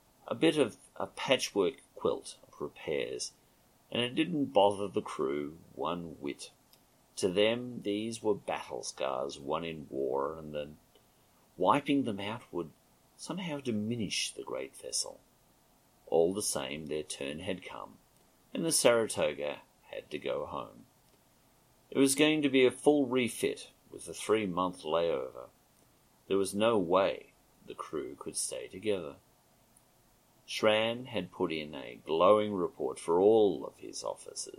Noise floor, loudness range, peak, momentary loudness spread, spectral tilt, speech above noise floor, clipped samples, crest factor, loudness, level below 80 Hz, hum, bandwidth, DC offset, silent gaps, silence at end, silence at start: -66 dBFS; 6 LU; -8 dBFS; 16 LU; -4 dB/octave; 34 dB; under 0.1%; 26 dB; -32 LUFS; -68 dBFS; none; 16 kHz; under 0.1%; none; 0.1 s; 0.25 s